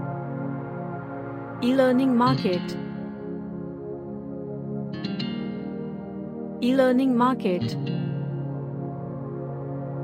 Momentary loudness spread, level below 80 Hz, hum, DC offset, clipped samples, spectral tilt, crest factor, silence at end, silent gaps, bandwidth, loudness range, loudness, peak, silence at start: 15 LU; -60 dBFS; none; under 0.1%; under 0.1%; -8 dB/octave; 18 dB; 0 s; none; 13.5 kHz; 8 LU; -27 LUFS; -8 dBFS; 0 s